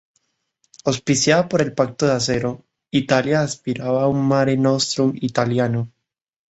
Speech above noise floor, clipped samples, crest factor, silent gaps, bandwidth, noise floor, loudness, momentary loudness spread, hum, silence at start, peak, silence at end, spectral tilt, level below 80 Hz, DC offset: 50 dB; under 0.1%; 18 dB; none; 8.2 kHz; -69 dBFS; -19 LUFS; 8 LU; none; 0.85 s; -2 dBFS; 0.6 s; -5 dB/octave; -54 dBFS; under 0.1%